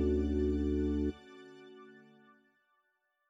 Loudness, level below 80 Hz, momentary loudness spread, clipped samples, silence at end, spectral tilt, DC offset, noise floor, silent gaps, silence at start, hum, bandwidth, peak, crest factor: -33 LUFS; -42 dBFS; 22 LU; under 0.1%; 1.4 s; -9 dB/octave; under 0.1%; -79 dBFS; none; 0 s; none; 7.4 kHz; -20 dBFS; 16 dB